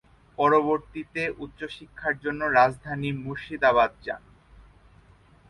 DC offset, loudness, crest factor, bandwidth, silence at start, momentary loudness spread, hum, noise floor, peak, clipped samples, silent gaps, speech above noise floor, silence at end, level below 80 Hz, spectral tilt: under 0.1%; -25 LUFS; 20 dB; 11.5 kHz; 0.4 s; 16 LU; none; -56 dBFS; -8 dBFS; under 0.1%; none; 30 dB; 1.3 s; -54 dBFS; -6.5 dB/octave